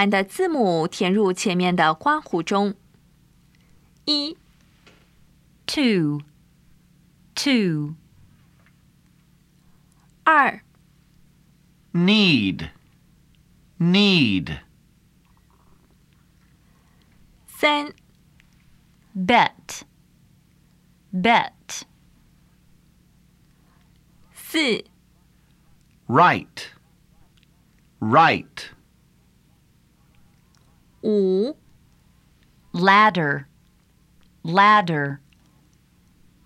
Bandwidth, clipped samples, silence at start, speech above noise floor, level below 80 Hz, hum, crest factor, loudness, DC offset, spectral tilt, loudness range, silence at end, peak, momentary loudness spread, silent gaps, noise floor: 15 kHz; under 0.1%; 0 s; 39 dB; -58 dBFS; none; 22 dB; -20 LUFS; under 0.1%; -5 dB/octave; 8 LU; 1.3 s; -2 dBFS; 21 LU; none; -58 dBFS